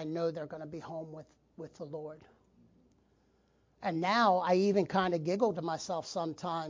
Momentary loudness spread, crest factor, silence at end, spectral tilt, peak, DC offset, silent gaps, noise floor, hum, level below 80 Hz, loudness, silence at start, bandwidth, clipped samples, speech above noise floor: 19 LU; 18 dB; 0 s; -5.5 dB/octave; -16 dBFS; under 0.1%; none; -70 dBFS; none; -72 dBFS; -32 LUFS; 0 s; 7.6 kHz; under 0.1%; 37 dB